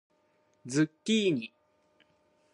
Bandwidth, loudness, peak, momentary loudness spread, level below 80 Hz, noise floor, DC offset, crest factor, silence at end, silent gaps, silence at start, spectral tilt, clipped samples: 11 kHz; -30 LUFS; -14 dBFS; 17 LU; -82 dBFS; -70 dBFS; under 0.1%; 18 dB; 1.05 s; none; 0.65 s; -5 dB/octave; under 0.1%